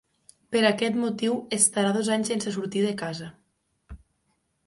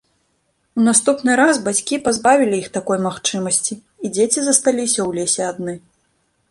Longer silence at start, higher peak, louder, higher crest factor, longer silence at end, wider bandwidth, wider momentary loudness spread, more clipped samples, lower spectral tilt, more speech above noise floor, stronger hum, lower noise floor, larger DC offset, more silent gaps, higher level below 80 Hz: second, 0.5 s vs 0.75 s; second, -4 dBFS vs 0 dBFS; second, -25 LUFS vs -17 LUFS; about the same, 22 dB vs 18 dB; about the same, 0.7 s vs 0.7 s; about the same, 11.5 kHz vs 12 kHz; about the same, 11 LU vs 11 LU; neither; about the same, -3.5 dB/octave vs -3 dB/octave; about the same, 48 dB vs 48 dB; neither; first, -73 dBFS vs -66 dBFS; neither; neither; about the same, -58 dBFS vs -58 dBFS